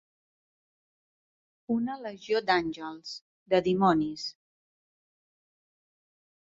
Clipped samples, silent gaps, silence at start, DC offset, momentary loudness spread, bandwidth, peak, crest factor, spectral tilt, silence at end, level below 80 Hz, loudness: under 0.1%; 3.22-3.46 s; 1.7 s; under 0.1%; 15 LU; 7.8 kHz; -10 dBFS; 22 dB; -6 dB/octave; 2.2 s; -68 dBFS; -29 LUFS